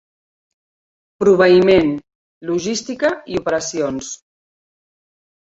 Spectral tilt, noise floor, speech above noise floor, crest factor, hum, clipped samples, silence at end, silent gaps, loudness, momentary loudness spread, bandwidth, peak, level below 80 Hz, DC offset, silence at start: -5 dB/octave; under -90 dBFS; over 74 dB; 18 dB; none; under 0.1%; 1.25 s; 2.15-2.41 s; -16 LUFS; 18 LU; 8 kHz; -2 dBFS; -50 dBFS; under 0.1%; 1.2 s